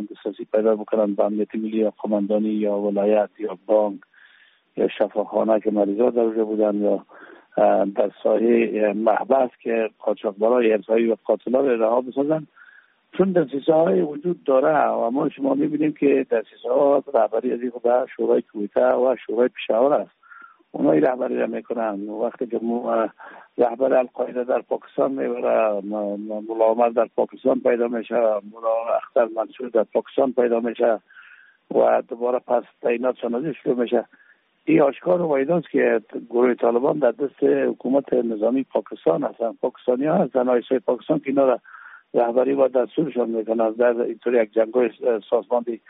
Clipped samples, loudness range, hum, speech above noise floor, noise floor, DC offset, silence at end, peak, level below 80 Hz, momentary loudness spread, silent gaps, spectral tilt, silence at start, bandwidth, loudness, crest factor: under 0.1%; 3 LU; none; 35 dB; -56 dBFS; under 0.1%; 0.15 s; -6 dBFS; -72 dBFS; 7 LU; none; -6 dB/octave; 0 s; 3.9 kHz; -21 LUFS; 16 dB